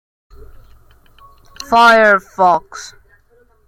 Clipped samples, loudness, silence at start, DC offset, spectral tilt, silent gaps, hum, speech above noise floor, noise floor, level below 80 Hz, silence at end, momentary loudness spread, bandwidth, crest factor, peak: under 0.1%; -11 LUFS; 1.6 s; under 0.1%; -3.5 dB/octave; none; none; 41 dB; -52 dBFS; -46 dBFS; 0.8 s; 25 LU; 16 kHz; 16 dB; 0 dBFS